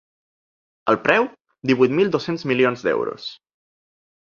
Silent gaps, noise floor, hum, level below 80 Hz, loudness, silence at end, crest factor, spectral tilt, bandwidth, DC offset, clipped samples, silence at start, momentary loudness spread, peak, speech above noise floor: none; under -90 dBFS; none; -64 dBFS; -20 LUFS; 0.9 s; 22 dB; -6.5 dB/octave; 7.2 kHz; under 0.1%; under 0.1%; 0.85 s; 11 LU; 0 dBFS; over 71 dB